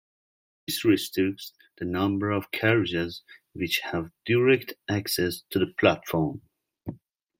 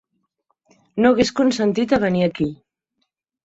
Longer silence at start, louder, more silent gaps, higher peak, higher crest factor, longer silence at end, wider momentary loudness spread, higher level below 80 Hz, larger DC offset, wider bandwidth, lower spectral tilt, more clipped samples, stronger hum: second, 0.7 s vs 0.95 s; second, -26 LUFS vs -19 LUFS; neither; second, -6 dBFS vs -2 dBFS; about the same, 22 dB vs 18 dB; second, 0.45 s vs 0.9 s; first, 18 LU vs 10 LU; second, -60 dBFS vs -52 dBFS; neither; first, 16.5 kHz vs 8 kHz; about the same, -5 dB/octave vs -6 dB/octave; neither; neither